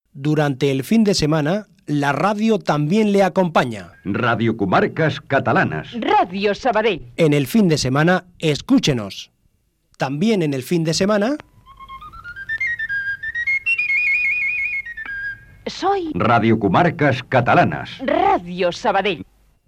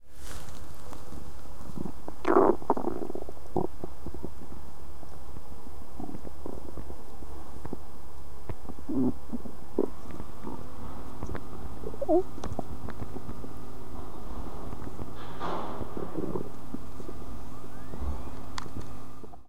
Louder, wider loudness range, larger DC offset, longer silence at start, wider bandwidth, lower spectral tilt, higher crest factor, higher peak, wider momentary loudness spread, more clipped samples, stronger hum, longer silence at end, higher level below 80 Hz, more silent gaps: first, -18 LUFS vs -35 LUFS; second, 4 LU vs 14 LU; second, under 0.1% vs 6%; first, 0.15 s vs 0 s; about the same, 16 kHz vs 16 kHz; second, -5.5 dB/octave vs -7 dB/octave; second, 14 dB vs 26 dB; first, -4 dBFS vs -8 dBFS; second, 11 LU vs 17 LU; neither; neither; first, 0.45 s vs 0 s; about the same, -48 dBFS vs -46 dBFS; neither